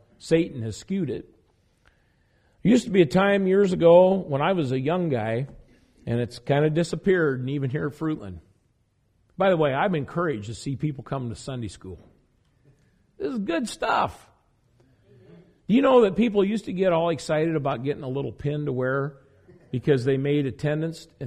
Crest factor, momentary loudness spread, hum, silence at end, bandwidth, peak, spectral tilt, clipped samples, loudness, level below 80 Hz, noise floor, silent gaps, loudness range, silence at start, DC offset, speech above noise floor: 18 dB; 14 LU; none; 0 s; 11.5 kHz; -6 dBFS; -7 dB/octave; under 0.1%; -24 LUFS; -56 dBFS; -67 dBFS; none; 10 LU; 0.25 s; under 0.1%; 44 dB